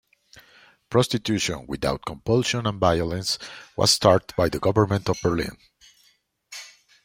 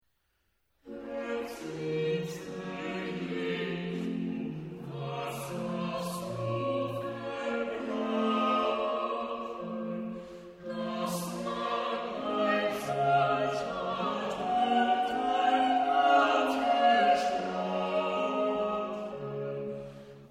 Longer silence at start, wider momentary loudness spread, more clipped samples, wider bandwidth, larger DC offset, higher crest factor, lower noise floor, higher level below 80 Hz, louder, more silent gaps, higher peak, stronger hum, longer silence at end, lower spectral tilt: second, 0.35 s vs 0.85 s; about the same, 14 LU vs 12 LU; neither; about the same, 16 kHz vs 15.5 kHz; neither; about the same, 22 dB vs 18 dB; second, -64 dBFS vs -76 dBFS; first, -48 dBFS vs -66 dBFS; first, -23 LUFS vs -31 LUFS; neither; first, -2 dBFS vs -12 dBFS; neither; first, 0.4 s vs 0 s; about the same, -4.5 dB/octave vs -5.5 dB/octave